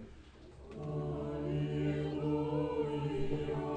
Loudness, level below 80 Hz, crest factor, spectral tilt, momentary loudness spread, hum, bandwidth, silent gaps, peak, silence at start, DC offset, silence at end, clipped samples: -37 LUFS; -52 dBFS; 14 dB; -8.5 dB/octave; 19 LU; none; 8.6 kHz; none; -22 dBFS; 0 s; under 0.1%; 0 s; under 0.1%